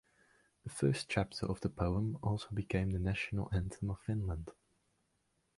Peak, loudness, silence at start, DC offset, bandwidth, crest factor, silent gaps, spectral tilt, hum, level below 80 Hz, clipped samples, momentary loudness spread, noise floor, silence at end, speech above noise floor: -18 dBFS; -37 LUFS; 0.65 s; under 0.1%; 11.5 kHz; 20 dB; none; -6.5 dB/octave; none; -50 dBFS; under 0.1%; 7 LU; -79 dBFS; 1.05 s; 43 dB